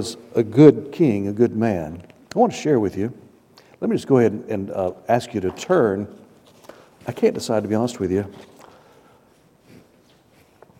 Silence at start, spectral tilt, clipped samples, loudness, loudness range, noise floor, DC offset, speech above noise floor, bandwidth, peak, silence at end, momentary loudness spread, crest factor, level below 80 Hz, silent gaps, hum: 0 s; -7 dB/octave; under 0.1%; -20 LUFS; 7 LU; -55 dBFS; under 0.1%; 36 dB; 15.5 kHz; 0 dBFS; 2.4 s; 13 LU; 22 dB; -58 dBFS; none; none